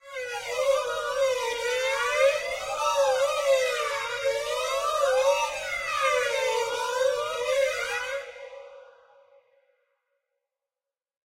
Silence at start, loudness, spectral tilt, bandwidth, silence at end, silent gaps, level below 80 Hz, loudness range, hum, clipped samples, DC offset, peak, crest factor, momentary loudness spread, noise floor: 0.05 s; -26 LUFS; 1 dB/octave; 16 kHz; 2.4 s; none; -62 dBFS; 7 LU; none; under 0.1%; under 0.1%; -10 dBFS; 16 dB; 8 LU; under -90 dBFS